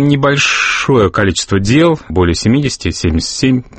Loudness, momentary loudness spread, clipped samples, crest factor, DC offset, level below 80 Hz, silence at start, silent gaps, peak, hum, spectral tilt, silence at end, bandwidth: -12 LUFS; 5 LU; under 0.1%; 12 dB; under 0.1%; -30 dBFS; 0 s; none; 0 dBFS; none; -5 dB/octave; 0.1 s; 8.8 kHz